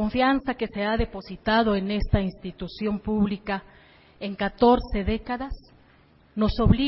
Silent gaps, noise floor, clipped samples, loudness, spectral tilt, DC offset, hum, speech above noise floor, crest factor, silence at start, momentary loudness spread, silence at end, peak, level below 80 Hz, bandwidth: none; -57 dBFS; under 0.1%; -25 LUFS; -11 dB/octave; under 0.1%; none; 33 dB; 20 dB; 0 s; 14 LU; 0 s; -6 dBFS; -36 dBFS; 5.8 kHz